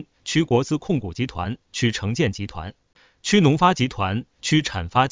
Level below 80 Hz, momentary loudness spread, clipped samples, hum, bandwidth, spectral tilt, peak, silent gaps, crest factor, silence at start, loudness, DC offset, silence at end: -44 dBFS; 13 LU; under 0.1%; none; 7.8 kHz; -5.5 dB/octave; -2 dBFS; none; 20 dB; 0 s; -22 LUFS; 0.1%; 0 s